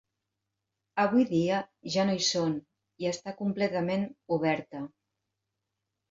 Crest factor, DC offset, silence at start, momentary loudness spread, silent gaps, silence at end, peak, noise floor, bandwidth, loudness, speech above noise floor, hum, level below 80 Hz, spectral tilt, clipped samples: 18 dB; under 0.1%; 0.95 s; 11 LU; none; 1.25 s; -14 dBFS; -85 dBFS; 7.8 kHz; -29 LUFS; 56 dB; none; -72 dBFS; -4.5 dB/octave; under 0.1%